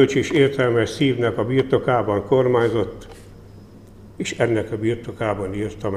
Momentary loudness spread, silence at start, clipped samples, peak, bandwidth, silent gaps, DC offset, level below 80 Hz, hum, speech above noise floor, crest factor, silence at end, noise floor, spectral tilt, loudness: 9 LU; 0 s; under 0.1%; -4 dBFS; 12.5 kHz; none; 0.1%; -48 dBFS; none; 23 dB; 16 dB; 0 s; -43 dBFS; -6.5 dB/octave; -20 LUFS